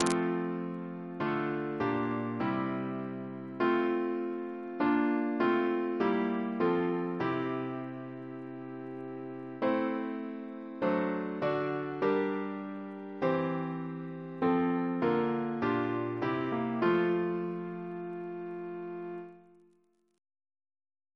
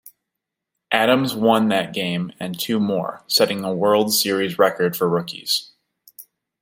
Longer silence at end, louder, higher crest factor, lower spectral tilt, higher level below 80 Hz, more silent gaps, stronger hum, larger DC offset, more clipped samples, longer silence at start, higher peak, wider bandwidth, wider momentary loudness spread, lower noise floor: first, 1.75 s vs 0.4 s; second, -33 LUFS vs -20 LUFS; about the same, 24 dB vs 20 dB; first, -7 dB/octave vs -4 dB/octave; second, -72 dBFS vs -66 dBFS; neither; neither; neither; neither; about the same, 0 s vs 0.05 s; second, -8 dBFS vs -2 dBFS; second, 11 kHz vs 16.5 kHz; first, 12 LU vs 7 LU; second, -70 dBFS vs -82 dBFS